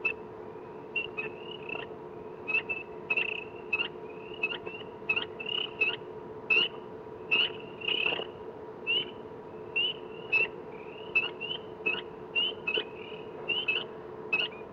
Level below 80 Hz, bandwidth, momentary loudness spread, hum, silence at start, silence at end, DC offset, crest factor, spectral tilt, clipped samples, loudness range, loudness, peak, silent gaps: -68 dBFS; 7.2 kHz; 16 LU; none; 0 s; 0 s; under 0.1%; 18 dB; -4.5 dB/octave; under 0.1%; 4 LU; -31 LUFS; -16 dBFS; none